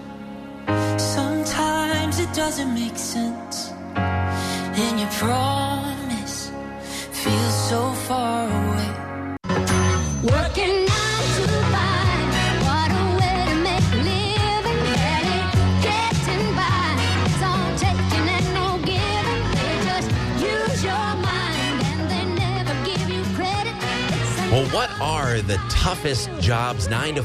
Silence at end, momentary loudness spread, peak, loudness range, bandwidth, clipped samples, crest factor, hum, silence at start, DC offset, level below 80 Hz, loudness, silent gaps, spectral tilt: 0 s; 6 LU; -8 dBFS; 4 LU; 14 kHz; under 0.1%; 12 dB; none; 0 s; under 0.1%; -36 dBFS; -22 LUFS; none; -5 dB/octave